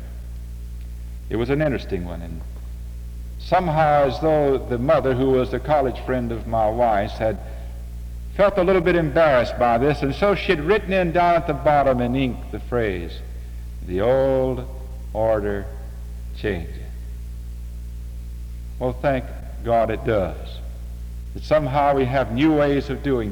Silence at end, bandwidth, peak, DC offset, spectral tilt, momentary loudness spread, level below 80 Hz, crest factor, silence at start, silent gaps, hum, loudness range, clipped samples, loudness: 0 s; 19.5 kHz; -6 dBFS; under 0.1%; -7.5 dB/octave; 17 LU; -32 dBFS; 16 dB; 0 s; none; none; 9 LU; under 0.1%; -21 LUFS